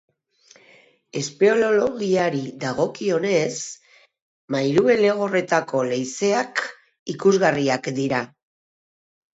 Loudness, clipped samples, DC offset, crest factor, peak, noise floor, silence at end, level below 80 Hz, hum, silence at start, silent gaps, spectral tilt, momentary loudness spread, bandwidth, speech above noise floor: -21 LUFS; under 0.1%; under 0.1%; 18 dB; -4 dBFS; -55 dBFS; 1.1 s; -64 dBFS; none; 1.15 s; 4.22-4.48 s, 6.99-7.06 s; -5 dB/octave; 13 LU; 8 kHz; 35 dB